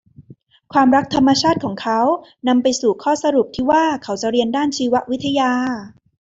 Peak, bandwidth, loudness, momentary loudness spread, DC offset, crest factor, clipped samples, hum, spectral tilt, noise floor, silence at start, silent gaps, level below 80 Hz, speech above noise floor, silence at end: -2 dBFS; 7.8 kHz; -17 LUFS; 7 LU; under 0.1%; 16 dB; under 0.1%; none; -4.5 dB/octave; -47 dBFS; 0.2 s; none; -52 dBFS; 30 dB; 0.45 s